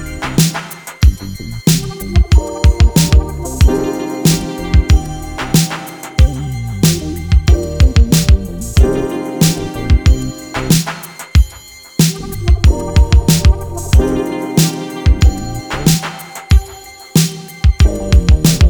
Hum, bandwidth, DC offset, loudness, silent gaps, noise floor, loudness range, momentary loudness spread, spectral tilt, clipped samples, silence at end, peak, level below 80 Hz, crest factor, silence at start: none; over 20 kHz; under 0.1%; -14 LUFS; none; -36 dBFS; 2 LU; 11 LU; -5.5 dB/octave; under 0.1%; 0 s; 0 dBFS; -14 dBFS; 12 dB; 0 s